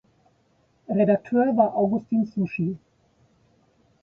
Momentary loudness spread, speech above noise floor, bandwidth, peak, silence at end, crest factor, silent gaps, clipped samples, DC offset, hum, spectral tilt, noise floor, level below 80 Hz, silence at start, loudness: 8 LU; 42 dB; 5.6 kHz; -6 dBFS; 1.25 s; 20 dB; none; under 0.1%; under 0.1%; none; -10.5 dB/octave; -64 dBFS; -66 dBFS; 0.9 s; -23 LUFS